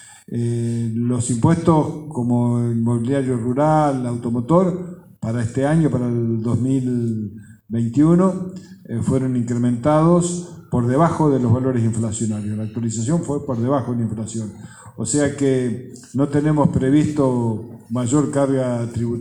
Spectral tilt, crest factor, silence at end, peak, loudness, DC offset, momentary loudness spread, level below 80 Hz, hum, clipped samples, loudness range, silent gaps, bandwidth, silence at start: -7.5 dB/octave; 18 dB; 0 s; 0 dBFS; -20 LUFS; under 0.1%; 11 LU; -48 dBFS; none; under 0.1%; 3 LU; none; 11 kHz; 0 s